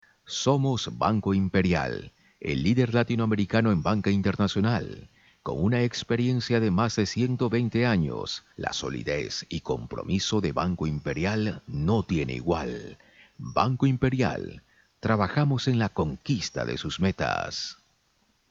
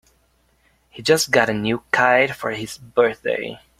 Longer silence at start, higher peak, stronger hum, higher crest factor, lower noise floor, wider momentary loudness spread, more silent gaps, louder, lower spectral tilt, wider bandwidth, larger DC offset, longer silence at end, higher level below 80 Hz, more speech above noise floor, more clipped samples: second, 0.3 s vs 0.95 s; second, -6 dBFS vs 0 dBFS; neither; about the same, 20 dB vs 20 dB; first, -68 dBFS vs -62 dBFS; about the same, 9 LU vs 11 LU; neither; second, -27 LUFS vs -19 LUFS; first, -6 dB/octave vs -3.5 dB/octave; second, 7.8 kHz vs 16 kHz; neither; first, 0.75 s vs 0.25 s; first, -50 dBFS vs -56 dBFS; about the same, 42 dB vs 42 dB; neither